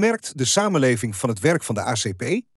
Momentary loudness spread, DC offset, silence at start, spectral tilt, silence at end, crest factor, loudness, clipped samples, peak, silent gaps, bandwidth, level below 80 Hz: 6 LU; under 0.1%; 0 s; -4 dB/octave; 0.15 s; 16 dB; -21 LUFS; under 0.1%; -6 dBFS; none; 13.5 kHz; -66 dBFS